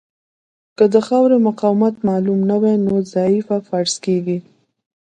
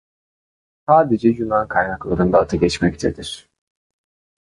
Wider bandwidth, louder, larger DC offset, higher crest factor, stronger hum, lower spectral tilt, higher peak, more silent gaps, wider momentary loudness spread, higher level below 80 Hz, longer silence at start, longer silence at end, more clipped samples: second, 9.6 kHz vs 11.5 kHz; about the same, -16 LUFS vs -18 LUFS; neither; about the same, 16 dB vs 18 dB; neither; about the same, -6.5 dB/octave vs -6 dB/octave; about the same, 0 dBFS vs -2 dBFS; neither; second, 6 LU vs 15 LU; second, -60 dBFS vs -40 dBFS; about the same, 0.8 s vs 0.9 s; second, 0.6 s vs 1.05 s; neither